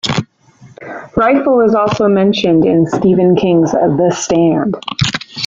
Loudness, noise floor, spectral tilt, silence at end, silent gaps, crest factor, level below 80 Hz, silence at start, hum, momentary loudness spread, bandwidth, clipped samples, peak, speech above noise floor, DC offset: -12 LUFS; -43 dBFS; -6 dB/octave; 0 s; none; 12 dB; -44 dBFS; 0.05 s; none; 8 LU; 7.8 kHz; under 0.1%; 0 dBFS; 32 dB; under 0.1%